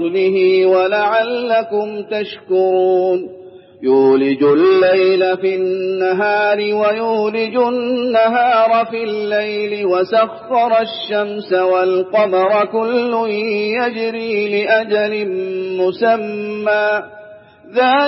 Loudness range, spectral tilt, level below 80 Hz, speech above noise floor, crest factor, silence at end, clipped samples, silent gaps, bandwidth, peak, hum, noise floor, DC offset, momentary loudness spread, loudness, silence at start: 3 LU; -9 dB/octave; -70 dBFS; 25 dB; 14 dB; 0 s; under 0.1%; none; 5.8 kHz; -2 dBFS; none; -39 dBFS; under 0.1%; 8 LU; -15 LUFS; 0 s